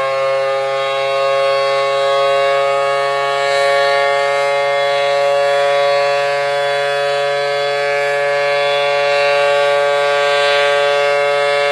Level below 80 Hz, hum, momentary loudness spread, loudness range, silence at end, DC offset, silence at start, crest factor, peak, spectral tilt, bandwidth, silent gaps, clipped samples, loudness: -60 dBFS; none; 3 LU; 2 LU; 0 s; under 0.1%; 0 s; 12 dB; -4 dBFS; -2 dB/octave; 12 kHz; none; under 0.1%; -14 LUFS